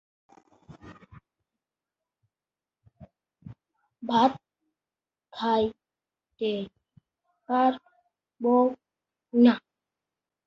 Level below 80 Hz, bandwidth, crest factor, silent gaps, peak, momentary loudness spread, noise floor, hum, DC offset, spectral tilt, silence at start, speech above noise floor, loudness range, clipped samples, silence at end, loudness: -68 dBFS; 6.4 kHz; 22 dB; none; -8 dBFS; 20 LU; under -90 dBFS; none; under 0.1%; -7 dB/octave; 0.7 s; over 67 dB; 6 LU; under 0.1%; 0.9 s; -25 LUFS